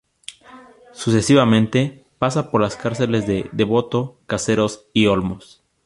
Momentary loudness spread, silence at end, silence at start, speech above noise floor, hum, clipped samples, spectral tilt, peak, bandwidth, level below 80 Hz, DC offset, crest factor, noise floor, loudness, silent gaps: 12 LU; 0.45 s; 0.3 s; 26 dB; none; under 0.1%; -5.5 dB/octave; -2 dBFS; 11.5 kHz; -48 dBFS; under 0.1%; 18 dB; -45 dBFS; -19 LUFS; none